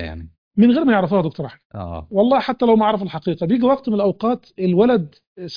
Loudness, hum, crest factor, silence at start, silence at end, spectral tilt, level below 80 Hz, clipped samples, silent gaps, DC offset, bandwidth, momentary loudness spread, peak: -18 LUFS; none; 16 dB; 0 s; 0 s; -9 dB/octave; -46 dBFS; under 0.1%; 0.38-0.51 s, 1.65-1.70 s, 5.27-5.36 s; under 0.1%; 5.2 kHz; 16 LU; -2 dBFS